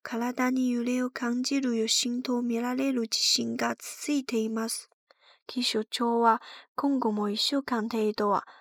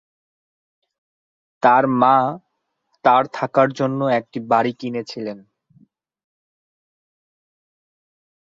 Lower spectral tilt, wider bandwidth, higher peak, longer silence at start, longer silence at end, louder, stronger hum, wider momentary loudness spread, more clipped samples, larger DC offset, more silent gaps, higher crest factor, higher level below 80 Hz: second, -2.5 dB/octave vs -7 dB/octave; first, 18 kHz vs 7.6 kHz; second, -10 dBFS vs -2 dBFS; second, 0.05 s vs 1.65 s; second, 0.1 s vs 3.1 s; second, -28 LUFS vs -18 LUFS; neither; second, 7 LU vs 13 LU; neither; neither; first, 4.94-5.07 s, 5.42-5.46 s, 6.68-6.75 s vs none; about the same, 18 dB vs 20 dB; second, -80 dBFS vs -68 dBFS